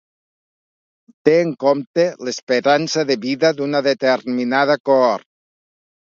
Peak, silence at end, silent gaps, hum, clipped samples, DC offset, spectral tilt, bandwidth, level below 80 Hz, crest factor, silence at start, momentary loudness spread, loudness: 0 dBFS; 0.95 s; 1.87-1.94 s, 2.43-2.47 s, 4.80-4.84 s; none; under 0.1%; under 0.1%; -4.5 dB/octave; 7.6 kHz; -70 dBFS; 18 dB; 1.25 s; 5 LU; -17 LUFS